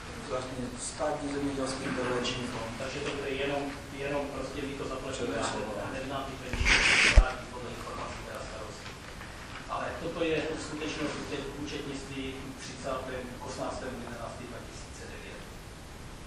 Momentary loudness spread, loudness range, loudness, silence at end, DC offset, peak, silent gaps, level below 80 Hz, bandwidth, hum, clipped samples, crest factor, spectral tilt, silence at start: 13 LU; 11 LU; -32 LUFS; 0 s; under 0.1%; -4 dBFS; none; -40 dBFS; 12.5 kHz; none; under 0.1%; 28 dB; -3.5 dB/octave; 0 s